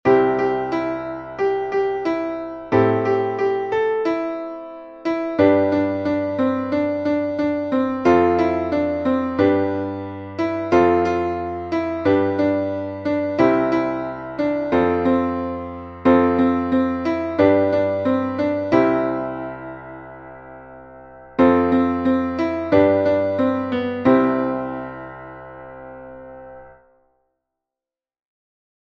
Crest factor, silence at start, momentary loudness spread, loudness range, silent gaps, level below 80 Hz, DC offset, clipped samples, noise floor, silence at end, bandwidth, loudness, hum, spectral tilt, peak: 18 dB; 0.05 s; 18 LU; 4 LU; none; -50 dBFS; under 0.1%; under 0.1%; -90 dBFS; 2.2 s; 6.8 kHz; -20 LUFS; none; -8 dB/octave; -2 dBFS